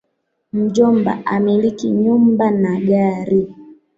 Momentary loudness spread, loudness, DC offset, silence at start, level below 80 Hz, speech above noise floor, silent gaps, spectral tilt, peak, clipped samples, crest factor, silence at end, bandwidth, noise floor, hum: 5 LU; -16 LUFS; under 0.1%; 0.55 s; -56 dBFS; 55 dB; none; -8 dB/octave; -2 dBFS; under 0.1%; 14 dB; 0.25 s; 7.6 kHz; -70 dBFS; none